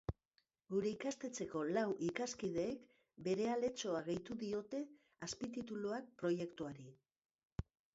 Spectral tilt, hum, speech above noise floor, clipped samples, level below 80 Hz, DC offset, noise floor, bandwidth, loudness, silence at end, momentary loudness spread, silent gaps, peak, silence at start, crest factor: -5.5 dB/octave; none; 41 dB; under 0.1%; -64 dBFS; under 0.1%; -83 dBFS; 7.6 kHz; -43 LUFS; 0.3 s; 12 LU; 7.18-7.22 s, 7.31-7.39 s, 7.45-7.56 s; -24 dBFS; 0.1 s; 18 dB